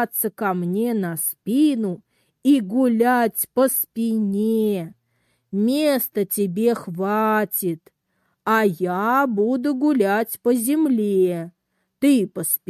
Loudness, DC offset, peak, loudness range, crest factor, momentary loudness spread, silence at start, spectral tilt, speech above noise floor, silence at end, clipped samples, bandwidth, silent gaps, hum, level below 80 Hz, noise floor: -21 LUFS; under 0.1%; -8 dBFS; 2 LU; 14 dB; 6 LU; 0 s; -5 dB/octave; 50 dB; 0.15 s; under 0.1%; 16 kHz; none; none; -70 dBFS; -70 dBFS